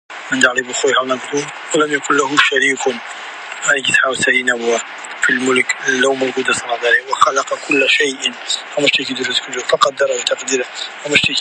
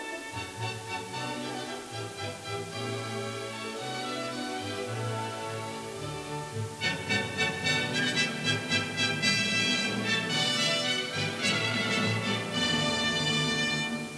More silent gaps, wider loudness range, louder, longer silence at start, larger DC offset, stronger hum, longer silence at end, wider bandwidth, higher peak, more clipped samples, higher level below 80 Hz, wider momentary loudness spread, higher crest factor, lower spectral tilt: neither; second, 1 LU vs 9 LU; first, -15 LUFS vs -29 LUFS; about the same, 0.1 s vs 0 s; neither; neither; about the same, 0 s vs 0 s; about the same, 11.5 kHz vs 11 kHz; first, 0 dBFS vs -10 dBFS; neither; about the same, -60 dBFS vs -62 dBFS; second, 8 LU vs 11 LU; about the same, 16 dB vs 20 dB; second, -1.5 dB/octave vs -3 dB/octave